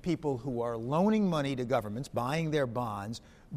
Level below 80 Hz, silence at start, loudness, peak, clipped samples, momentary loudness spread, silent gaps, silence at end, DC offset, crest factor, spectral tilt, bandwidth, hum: -58 dBFS; 0.05 s; -32 LUFS; -16 dBFS; under 0.1%; 9 LU; none; 0 s; under 0.1%; 16 dB; -7 dB/octave; 15.5 kHz; none